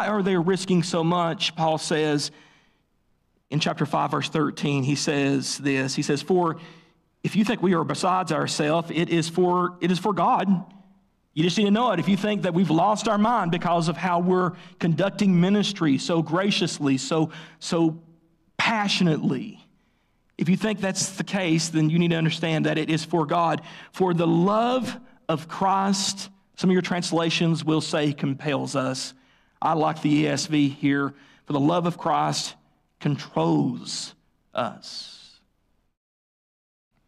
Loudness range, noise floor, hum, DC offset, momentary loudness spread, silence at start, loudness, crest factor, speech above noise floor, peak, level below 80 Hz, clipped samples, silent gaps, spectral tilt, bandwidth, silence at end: 4 LU; -68 dBFS; none; under 0.1%; 9 LU; 0 s; -24 LUFS; 12 dB; 45 dB; -12 dBFS; -64 dBFS; under 0.1%; none; -5 dB/octave; 13 kHz; 1.9 s